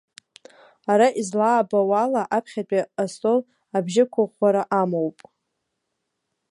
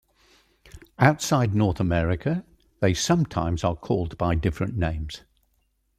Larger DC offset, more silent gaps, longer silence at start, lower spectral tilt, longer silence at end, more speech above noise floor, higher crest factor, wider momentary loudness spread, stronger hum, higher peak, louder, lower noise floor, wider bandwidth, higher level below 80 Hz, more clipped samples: neither; neither; first, 0.9 s vs 0.75 s; about the same, -6 dB/octave vs -6 dB/octave; first, 1.4 s vs 0.8 s; first, 57 dB vs 46 dB; second, 16 dB vs 22 dB; about the same, 8 LU vs 7 LU; neither; about the same, -6 dBFS vs -4 dBFS; about the same, -22 LUFS vs -24 LUFS; first, -78 dBFS vs -70 dBFS; second, 11.5 kHz vs 15 kHz; second, -76 dBFS vs -42 dBFS; neither